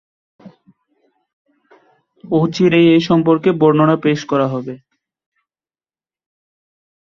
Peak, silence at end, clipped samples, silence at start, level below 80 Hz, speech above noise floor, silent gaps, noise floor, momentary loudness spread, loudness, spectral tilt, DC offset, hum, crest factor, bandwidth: -2 dBFS; 2.25 s; under 0.1%; 0.45 s; -58 dBFS; over 77 dB; 1.33-1.45 s; under -90 dBFS; 11 LU; -14 LUFS; -7.5 dB/octave; under 0.1%; none; 16 dB; 7.2 kHz